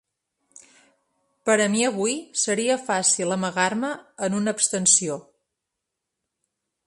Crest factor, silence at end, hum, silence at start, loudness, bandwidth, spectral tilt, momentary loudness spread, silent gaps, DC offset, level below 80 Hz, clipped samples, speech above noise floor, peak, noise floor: 24 dB; 1.65 s; none; 1.45 s; -22 LUFS; 11.5 kHz; -2.5 dB/octave; 12 LU; none; under 0.1%; -72 dBFS; under 0.1%; 60 dB; -2 dBFS; -83 dBFS